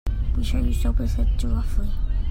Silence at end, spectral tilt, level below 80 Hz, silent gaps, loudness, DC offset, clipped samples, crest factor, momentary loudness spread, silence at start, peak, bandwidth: 0 s; -7 dB/octave; -22 dBFS; none; -26 LUFS; under 0.1%; under 0.1%; 12 dB; 4 LU; 0.05 s; -10 dBFS; 15 kHz